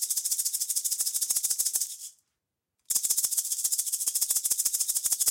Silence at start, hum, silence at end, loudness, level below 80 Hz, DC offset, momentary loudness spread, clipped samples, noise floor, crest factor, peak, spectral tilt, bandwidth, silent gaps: 0 s; none; 0 s; -26 LUFS; -74 dBFS; under 0.1%; 4 LU; under 0.1%; -84 dBFS; 20 dB; -10 dBFS; 3.5 dB/octave; 17 kHz; none